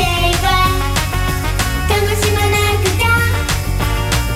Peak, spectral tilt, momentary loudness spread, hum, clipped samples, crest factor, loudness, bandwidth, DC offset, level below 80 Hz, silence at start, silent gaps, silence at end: -2 dBFS; -4 dB/octave; 5 LU; none; under 0.1%; 12 dB; -15 LUFS; 16.5 kHz; under 0.1%; -22 dBFS; 0 s; none; 0 s